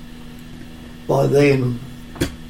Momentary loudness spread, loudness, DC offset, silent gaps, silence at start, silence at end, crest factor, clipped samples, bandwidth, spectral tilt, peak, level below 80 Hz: 23 LU; -18 LUFS; under 0.1%; none; 0 s; 0 s; 16 dB; under 0.1%; 16.5 kHz; -6.5 dB/octave; -4 dBFS; -40 dBFS